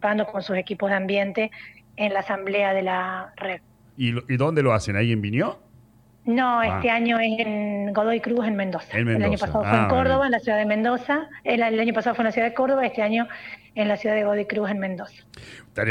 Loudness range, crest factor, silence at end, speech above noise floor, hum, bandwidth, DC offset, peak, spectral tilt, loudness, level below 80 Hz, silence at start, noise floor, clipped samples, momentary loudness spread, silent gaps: 3 LU; 16 dB; 0 s; 31 dB; none; 10.5 kHz; under 0.1%; -6 dBFS; -7 dB/octave; -23 LUFS; -50 dBFS; 0 s; -54 dBFS; under 0.1%; 11 LU; none